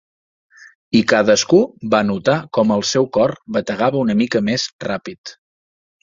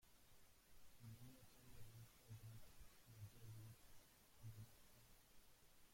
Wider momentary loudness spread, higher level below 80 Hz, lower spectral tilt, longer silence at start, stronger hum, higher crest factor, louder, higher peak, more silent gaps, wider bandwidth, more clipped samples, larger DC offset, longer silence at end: first, 11 LU vs 6 LU; first, -56 dBFS vs -74 dBFS; about the same, -4.5 dB/octave vs -4.5 dB/octave; first, 0.9 s vs 0 s; neither; about the same, 16 dB vs 16 dB; first, -17 LUFS vs -64 LUFS; first, -2 dBFS vs -46 dBFS; first, 4.73-4.79 s, 5.18-5.24 s vs none; second, 7.6 kHz vs 16.5 kHz; neither; neither; first, 0.7 s vs 0 s